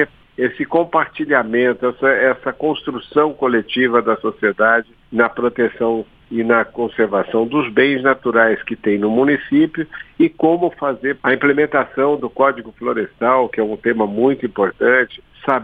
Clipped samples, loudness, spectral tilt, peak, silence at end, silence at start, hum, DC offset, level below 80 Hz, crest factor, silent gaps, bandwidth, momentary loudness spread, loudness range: under 0.1%; -17 LUFS; -8 dB/octave; 0 dBFS; 0 s; 0 s; none; under 0.1%; -54 dBFS; 16 dB; none; 4.9 kHz; 7 LU; 1 LU